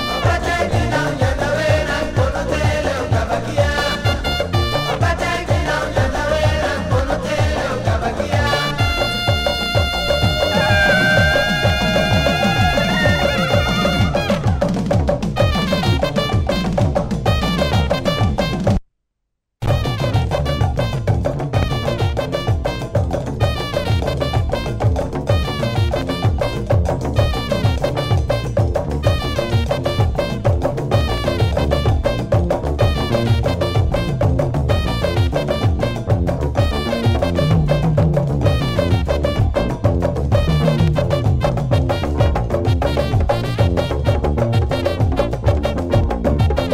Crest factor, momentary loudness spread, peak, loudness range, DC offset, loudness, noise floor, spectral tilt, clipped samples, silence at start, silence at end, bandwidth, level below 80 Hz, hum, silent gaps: 16 dB; 4 LU; -2 dBFS; 4 LU; under 0.1%; -18 LUFS; -75 dBFS; -6 dB/octave; under 0.1%; 0 s; 0 s; 15.5 kHz; -26 dBFS; none; none